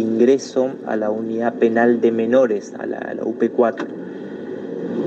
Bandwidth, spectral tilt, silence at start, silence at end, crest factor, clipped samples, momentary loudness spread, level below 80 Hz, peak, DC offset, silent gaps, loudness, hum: 8 kHz; -6.5 dB/octave; 0 s; 0 s; 16 dB; under 0.1%; 14 LU; -72 dBFS; -4 dBFS; under 0.1%; none; -19 LUFS; none